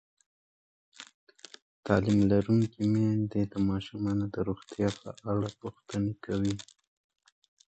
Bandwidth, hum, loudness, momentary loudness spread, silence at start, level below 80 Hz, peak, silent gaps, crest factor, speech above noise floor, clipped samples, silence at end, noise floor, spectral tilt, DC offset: 8.8 kHz; none; -30 LUFS; 25 LU; 1 s; -54 dBFS; -8 dBFS; 1.14-1.27 s, 1.62-1.83 s; 22 dB; over 61 dB; under 0.1%; 1.05 s; under -90 dBFS; -7.5 dB/octave; under 0.1%